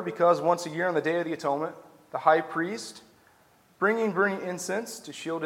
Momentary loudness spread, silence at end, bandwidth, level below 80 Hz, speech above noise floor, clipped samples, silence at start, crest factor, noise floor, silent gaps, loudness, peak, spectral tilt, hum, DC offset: 13 LU; 0 s; 16.5 kHz; -80 dBFS; 34 dB; under 0.1%; 0 s; 22 dB; -61 dBFS; none; -27 LUFS; -6 dBFS; -4.5 dB/octave; none; under 0.1%